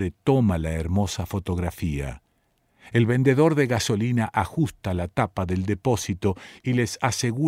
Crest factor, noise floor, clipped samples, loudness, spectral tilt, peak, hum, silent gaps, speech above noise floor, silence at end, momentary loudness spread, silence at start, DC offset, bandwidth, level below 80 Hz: 18 dB; -68 dBFS; under 0.1%; -24 LUFS; -6 dB/octave; -6 dBFS; none; none; 45 dB; 0 s; 9 LU; 0 s; under 0.1%; 16 kHz; -42 dBFS